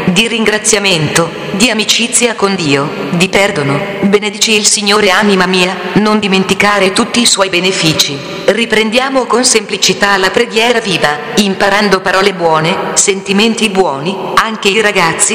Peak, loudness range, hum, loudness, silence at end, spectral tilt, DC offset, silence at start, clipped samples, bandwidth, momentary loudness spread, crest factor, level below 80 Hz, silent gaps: 0 dBFS; 1 LU; none; -10 LUFS; 0 s; -3 dB/octave; under 0.1%; 0 s; 0.7%; over 20 kHz; 5 LU; 10 dB; -44 dBFS; none